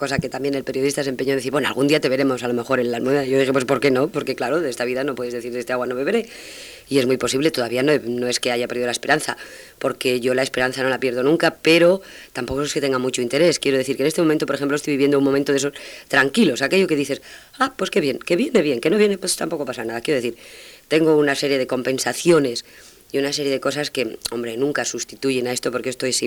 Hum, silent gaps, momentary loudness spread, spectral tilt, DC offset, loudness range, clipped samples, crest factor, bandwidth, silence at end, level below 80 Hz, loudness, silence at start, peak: none; none; 9 LU; -4 dB/octave; under 0.1%; 3 LU; under 0.1%; 18 dB; over 20 kHz; 0 s; -56 dBFS; -20 LUFS; 0 s; -2 dBFS